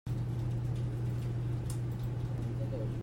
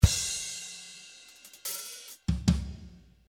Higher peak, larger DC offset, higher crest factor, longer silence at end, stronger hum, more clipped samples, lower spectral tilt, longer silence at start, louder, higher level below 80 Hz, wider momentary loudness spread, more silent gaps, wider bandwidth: second, -24 dBFS vs -4 dBFS; neither; second, 10 dB vs 26 dB; second, 0 s vs 0.3 s; neither; neither; first, -8 dB/octave vs -4 dB/octave; about the same, 0.05 s vs 0 s; second, -36 LUFS vs -32 LUFS; second, -48 dBFS vs -36 dBFS; second, 1 LU vs 20 LU; neither; second, 15.5 kHz vs 19 kHz